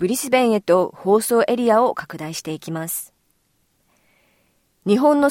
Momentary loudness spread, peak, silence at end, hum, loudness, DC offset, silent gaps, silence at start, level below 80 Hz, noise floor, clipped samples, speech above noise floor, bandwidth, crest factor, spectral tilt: 13 LU; -4 dBFS; 0 s; none; -19 LUFS; under 0.1%; none; 0 s; -66 dBFS; -65 dBFS; under 0.1%; 47 dB; 17 kHz; 16 dB; -4.5 dB/octave